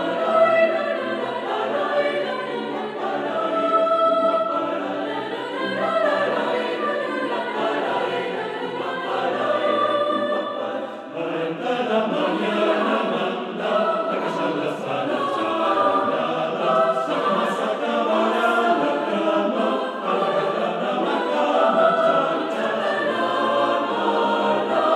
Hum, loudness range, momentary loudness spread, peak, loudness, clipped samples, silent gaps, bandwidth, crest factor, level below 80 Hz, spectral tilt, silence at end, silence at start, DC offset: none; 3 LU; 8 LU; -6 dBFS; -22 LUFS; under 0.1%; none; 11.5 kHz; 16 dB; -84 dBFS; -5.5 dB/octave; 0 s; 0 s; under 0.1%